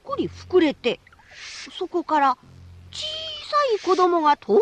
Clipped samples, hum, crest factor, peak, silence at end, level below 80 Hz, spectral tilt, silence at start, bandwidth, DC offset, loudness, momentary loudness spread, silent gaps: under 0.1%; none; 16 dB; -6 dBFS; 0 s; -58 dBFS; -4.5 dB/octave; 0.05 s; 9.4 kHz; under 0.1%; -22 LUFS; 16 LU; none